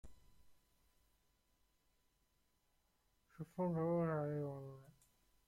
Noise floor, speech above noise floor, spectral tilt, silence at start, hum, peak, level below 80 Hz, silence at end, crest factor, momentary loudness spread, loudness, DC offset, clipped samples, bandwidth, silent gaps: -80 dBFS; 40 dB; -9.5 dB/octave; 0.05 s; none; -30 dBFS; -74 dBFS; 0.6 s; 18 dB; 18 LU; -41 LUFS; under 0.1%; under 0.1%; 13.5 kHz; none